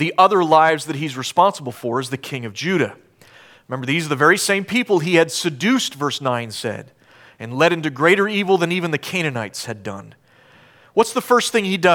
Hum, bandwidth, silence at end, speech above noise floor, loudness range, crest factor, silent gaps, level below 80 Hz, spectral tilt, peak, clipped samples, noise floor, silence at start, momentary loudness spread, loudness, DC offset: none; 18.5 kHz; 0 s; 32 dB; 3 LU; 18 dB; none; -68 dBFS; -4.5 dB/octave; -2 dBFS; under 0.1%; -50 dBFS; 0 s; 14 LU; -18 LUFS; under 0.1%